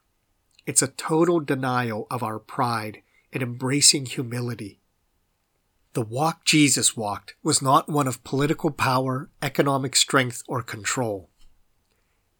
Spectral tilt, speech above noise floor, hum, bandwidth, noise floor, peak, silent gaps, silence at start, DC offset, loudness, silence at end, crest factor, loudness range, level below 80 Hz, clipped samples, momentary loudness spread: -3.5 dB/octave; 47 dB; none; over 20 kHz; -71 dBFS; -2 dBFS; none; 0.65 s; under 0.1%; -23 LUFS; 1.15 s; 22 dB; 3 LU; -60 dBFS; under 0.1%; 14 LU